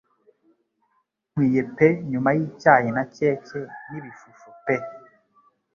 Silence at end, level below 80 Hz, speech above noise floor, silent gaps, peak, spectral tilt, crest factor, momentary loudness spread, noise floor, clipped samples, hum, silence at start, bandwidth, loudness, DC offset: 0.8 s; -64 dBFS; 49 dB; none; -2 dBFS; -8.5 dB/octave; 24 dB; 19 LU; -71 dBFS; under 0.1%; none; 1.35 s; 7.2 kHz; -22 LUFS; under 0.1%